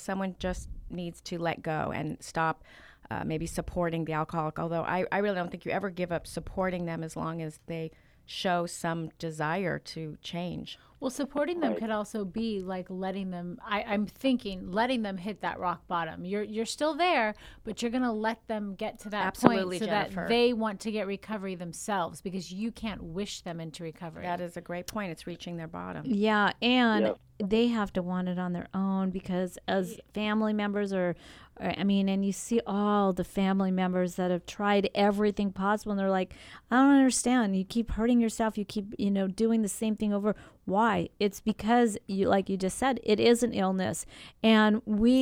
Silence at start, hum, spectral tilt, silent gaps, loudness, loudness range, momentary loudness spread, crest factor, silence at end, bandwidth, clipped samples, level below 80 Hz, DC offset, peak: 0 s; none; -5.5 dB/octave; none; -30 LUFS; 7 LU; 12 LU; 28 dB; 0 s; 16 kHz; under 0.1%; -54 dBFS; under 0.1%; 0 dBFS